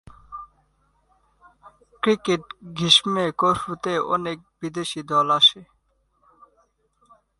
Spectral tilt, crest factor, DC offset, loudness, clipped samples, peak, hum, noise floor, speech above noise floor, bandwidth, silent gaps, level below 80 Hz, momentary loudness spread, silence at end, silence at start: -3.5 dB/octave; 22 dB; under 0.1%; -21 LUFS; under 0.1%; -2 dBFS; none; -67 dBFS; 45 dB; 11.5 kHz; none; -60 dBFS; 20 LU; 1.75 s; 0.3 s